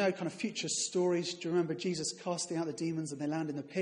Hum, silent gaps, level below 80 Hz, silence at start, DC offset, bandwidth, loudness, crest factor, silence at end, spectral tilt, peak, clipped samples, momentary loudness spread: none; none; -78 dBFS; 0 s; under 0.1%; 11.5 kHz; -35 LUFS; 16 dB; 0 s; -4 dB/octave; -18 dBFS; under 0.1%; 6 LU